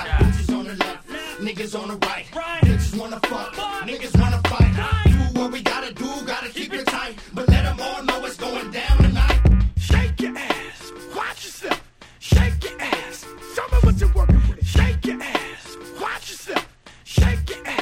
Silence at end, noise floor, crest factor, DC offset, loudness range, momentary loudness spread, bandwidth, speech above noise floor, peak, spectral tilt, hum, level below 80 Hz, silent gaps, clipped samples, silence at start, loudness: 0 s; -43 dBFS; 18 dB; under 0.1%; 4 LU; 12 LU; 15.5 kHz; 23 dB; -2 dBFS; -6 dB/octave; none; -22 dBFS; none; under 0.1%; 0 s; -22 LUFS